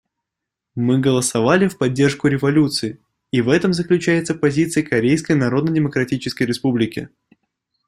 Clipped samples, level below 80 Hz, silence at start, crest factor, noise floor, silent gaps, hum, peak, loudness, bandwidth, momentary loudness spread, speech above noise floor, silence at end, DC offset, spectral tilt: under 0.1%; -54 dBFS; 0.75 s; 16 dB; -83 dBFS; none; none; -2 dBFS; -18 LUFS; 14 kHz; 7 LU; 65 dB; 0.8 s; under 0.1%; -5.5 dB/octave